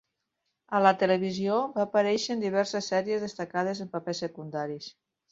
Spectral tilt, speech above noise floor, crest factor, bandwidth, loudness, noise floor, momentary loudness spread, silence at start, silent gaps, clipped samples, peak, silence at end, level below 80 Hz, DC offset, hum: -5 dB/octave; 53 dB; 22 dB; 7.8 kHz; -28 LUFS; -81 dBFS; 11 LU; 0.7 s; none; under 0.1%; -6 dBFS; 0.4 s; -72 dBFS; under 0.1%; none